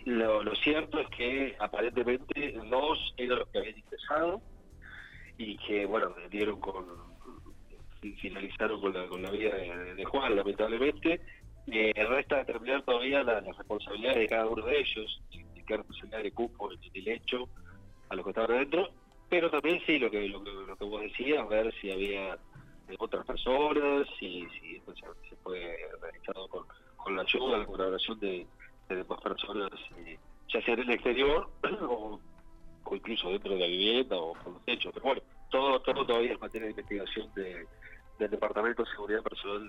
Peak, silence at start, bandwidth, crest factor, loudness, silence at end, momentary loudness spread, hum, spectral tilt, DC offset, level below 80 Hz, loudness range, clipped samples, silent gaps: -14 dBFS; 0 s; 10 kHz; 18 dB; -32 LUFS; 0 s; 17 LU; none; -5.5 dB/octave; under 0.1%; -52 dBFS; 6 LU; under 0.1%; none